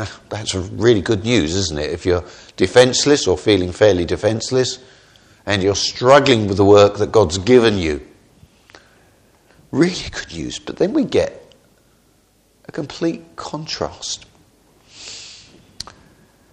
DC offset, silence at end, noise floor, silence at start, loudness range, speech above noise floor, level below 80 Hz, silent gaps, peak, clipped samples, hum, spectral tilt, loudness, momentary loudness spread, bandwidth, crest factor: under 0.1%; 1.15 s; -57 dBFS; 0 s; 14 LU; 40 dB; -44 dBFS; none; 0 dBFS; under 0.1%; none; -4.5 dB/octave; -17 LUFS; 20 LU; 11 kHz; 18 dB